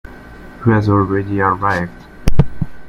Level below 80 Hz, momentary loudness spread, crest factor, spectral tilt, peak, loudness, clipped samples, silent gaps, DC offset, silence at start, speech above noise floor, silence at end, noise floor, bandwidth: -26 dBFS; 19 LU; 14 dB; -8 dB/octave; 0 dBFS; -17 LUFS; 0.1%; none; under 0.1%; 0.05 s; 20 dB; 0 s; -35 dBFS; 9.8 kHz